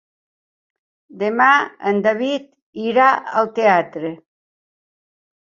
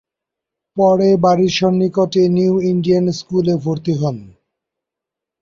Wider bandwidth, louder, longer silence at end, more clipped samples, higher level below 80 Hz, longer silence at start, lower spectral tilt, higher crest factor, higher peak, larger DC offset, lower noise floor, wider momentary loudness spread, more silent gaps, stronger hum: about the same, 7.4 kHz vs 7.4 kHz; about the same, -17 LUFS vs -15 LUFS; about the same, 1.25 s vs 1.15 s; neither; second, -68 dBFS vs -54 dBFS; first, 1.15 s vs 0.75 s; second, -5.5 dB/octave vs -7 dB/octave; about the same, 18 dB vs 14 dB; about the same, -2 dBFS vs -2 dBFS; neither; first, under -90 dBFS vs -84 dBFS; first, 13 LU vs 7 LU; first, 2.62-2.73 s vs none; neither